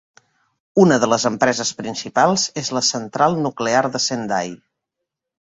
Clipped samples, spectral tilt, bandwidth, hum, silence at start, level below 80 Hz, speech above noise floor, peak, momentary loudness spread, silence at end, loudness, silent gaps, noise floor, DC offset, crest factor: under 0.1%; -3.5 dB/octave; 8 kHz; none; 0.75 s; -60 dBFS; 63 dB; -2 dBFS; 9 LU; 1 s; -18 LUFS; none; -81 dBFS; under 0.1%; 18 dB